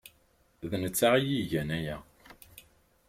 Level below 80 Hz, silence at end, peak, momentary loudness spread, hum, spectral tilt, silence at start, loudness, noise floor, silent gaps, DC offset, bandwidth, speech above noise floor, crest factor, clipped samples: -58 dBFS; 0.5 s; -12 dBFS; 20 LU; none; -4.5 dB/octave; 0.6 s; -29 LUFS; -67 dBFS; none; under 0.1%; 16.5 kHz; 38 dB; 20 dB; under 0.1%